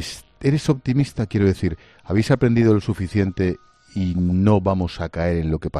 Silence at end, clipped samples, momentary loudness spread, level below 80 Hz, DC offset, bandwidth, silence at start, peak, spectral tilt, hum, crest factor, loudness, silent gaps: 0 s; under 0.1%; 9 LU; -42 dBFS; under 0.1%; 12.5 kHz; 0 s; -2 dBFS; -7.5 dB/octave; none; 18 dB; -20 LUFS; none